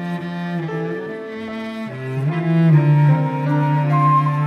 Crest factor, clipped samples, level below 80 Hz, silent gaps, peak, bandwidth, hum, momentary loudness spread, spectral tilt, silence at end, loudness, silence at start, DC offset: 14 dB; under 0.1%; -68 dBFS; none; -4 dBFS; 5.6 kHz; none; 14 LU; -9.5 dB/octave; 0 s; -18 LUFS; 0 s; under 0.1%